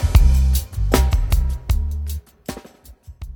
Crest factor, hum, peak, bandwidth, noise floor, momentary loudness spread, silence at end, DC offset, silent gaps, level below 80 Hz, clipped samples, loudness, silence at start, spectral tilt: 18 dB; none; 0 dBFS; 19 kHz; -44 dBFS; 18 LU; 0 s; under 0.1%; none; -18 dBFS; under 0.1%; -20 LUFS; 0 s; -5.5 dB/octave